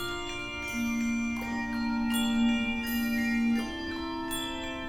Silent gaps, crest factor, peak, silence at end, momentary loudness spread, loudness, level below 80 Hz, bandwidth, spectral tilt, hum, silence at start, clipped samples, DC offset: none; 14 dB; -16 dBFS; 0 s; 8 LU; -30 LUFS; -48 dBFS; 19 kHz; -3.5 dB/octave; none; 0 s; under 0.1%; under 0.1%